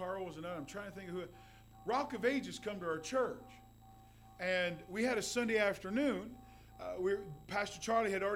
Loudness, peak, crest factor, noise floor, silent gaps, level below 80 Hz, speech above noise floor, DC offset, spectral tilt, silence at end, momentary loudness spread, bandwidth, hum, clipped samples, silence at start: -38 LUFS; -20 dBFS; 18 dB; -59 dBFS; none; -64 dBFS; 22 dB; under 0.1%; -4 dB/octave; 0 s; 14 LU; 17 kHz; none; under 0.1%; 0 s